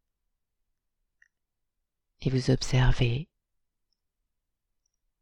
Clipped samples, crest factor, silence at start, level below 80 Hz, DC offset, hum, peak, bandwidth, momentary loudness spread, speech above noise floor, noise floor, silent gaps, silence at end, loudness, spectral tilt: under 0.1%; 22 dB; 2.2 s; -38 dBFS; under 0.1%; none; -10 dBFS; 10 kHz; 11 LU; 58 dB; -82 dBFS; none; 1.95 s; -27 LUFS; -6 dB/octave